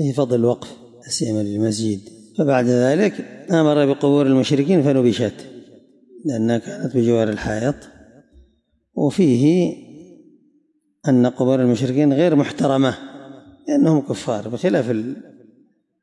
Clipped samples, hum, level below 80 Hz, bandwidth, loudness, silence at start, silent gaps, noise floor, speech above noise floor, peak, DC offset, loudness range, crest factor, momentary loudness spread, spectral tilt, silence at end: under 0.1%; none; -56 dBFS; 11.5 kHz; -18 LUFS; 0 s; none; -63 dBFS; 45 dB; -6 dBFS; under 0.1%; 5 LU; 14 dB; 14 LU; -6.5 dB/octave; 0.8 s